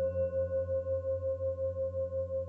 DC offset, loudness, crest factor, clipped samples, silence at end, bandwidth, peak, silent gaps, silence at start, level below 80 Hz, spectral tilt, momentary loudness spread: under 0.1%; -34 LUFS; 10 dB; under 0.1%; 0 s; 2.9 kHz; -24 dBFS; none; 0 s; -56 dBFS; -10.5 dB/octave; 3 LU